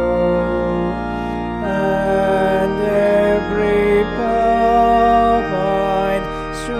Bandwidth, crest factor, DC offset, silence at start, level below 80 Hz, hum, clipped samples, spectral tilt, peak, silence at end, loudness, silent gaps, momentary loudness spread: 14 kHz; 12 dB; under 0.1%; 0 s; -34 dBFS; none; under 0.1%; -7 dB/octave; -4 dBFS; 0 s; -16 LUFS; none; 9 LU